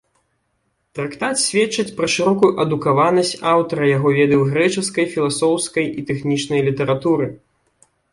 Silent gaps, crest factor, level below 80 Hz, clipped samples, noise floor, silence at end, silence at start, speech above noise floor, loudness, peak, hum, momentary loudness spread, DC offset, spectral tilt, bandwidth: none; 16 dB; -56 dBFS; under 0.1%; -69 dBFS; 0.75 s; 0.95 s; 51 dB; -18 LUFS; -2 dBFS; none; 7 LU; under 0.1%; -4.5 dB/octave; 11.5 kHz